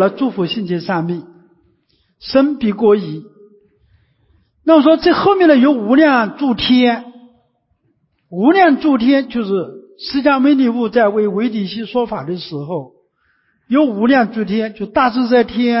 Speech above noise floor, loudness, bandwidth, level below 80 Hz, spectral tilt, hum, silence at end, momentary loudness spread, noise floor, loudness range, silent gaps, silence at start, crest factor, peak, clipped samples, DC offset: 49 dB; -14 LUFS; 5.8 kHz; -52 dBFS; -10 dB/octave; none; 0 s; 13 LU; -63 dBFS; 6 LU; none; 0 s; 14 dB; 0 dBFS; under 0.1%; under 0.1%